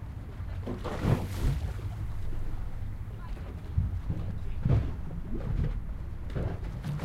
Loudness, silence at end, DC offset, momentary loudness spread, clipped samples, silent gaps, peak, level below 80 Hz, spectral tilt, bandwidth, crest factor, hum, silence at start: -35 LUFS; 0 s; under 0.1%; 11 LU; under 0.1%; none; -14 dBFS; -36 dBFS; -8 dB/octave; 15 kHz; 18 dB; none; 0 s